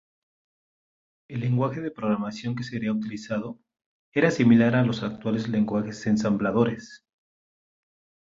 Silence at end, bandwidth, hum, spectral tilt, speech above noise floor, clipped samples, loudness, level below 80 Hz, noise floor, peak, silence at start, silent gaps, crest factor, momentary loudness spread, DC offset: 1.35 s; 7.6 kHz; none; -7 dB/octave; over 66 dB; under 0.1%; -25 LUFS; -60 dBFS; under -90 dBFS; -8 dBFS; 1.3 s; 3.86-4.12 s; 18 dB; 13 LU; under 0.1%